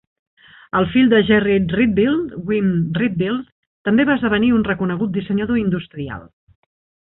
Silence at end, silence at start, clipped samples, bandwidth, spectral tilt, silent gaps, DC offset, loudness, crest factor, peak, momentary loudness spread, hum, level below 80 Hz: 0.85 s; 0.75 s; under 0.1%; 4.1 kHz; -12 dB/octave; 3.52-3.85 s; under 0.1%; -18 LUFS; 16 dB; -4 dBFS; 12 LU; none; -46 dBFS